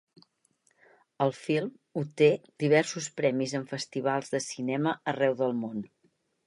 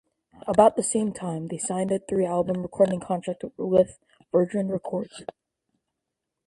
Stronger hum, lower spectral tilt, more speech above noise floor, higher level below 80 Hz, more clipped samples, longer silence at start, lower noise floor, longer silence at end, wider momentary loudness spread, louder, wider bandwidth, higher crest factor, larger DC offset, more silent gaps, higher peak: neither; about the same, -5 dB/octave vs -6 dB/octave; second, 43 dB vs 59 dB; second, -78 dBFS vs -60 dBFS; neither; first, 1.2 s vs 0.45 s; second, -71 dBFS vs -84 dBFS; second, 0.6 s vs 1.2 s; about the same, 11 LU vs 12 LU; second, -29 LUFS vs -25 LUFS; about the same, 11.5 kHz vs 11.5 kHz; about the same, 20 dB vs 22 dB; neither; neither; second, -8 dBFS vs -4 dBFS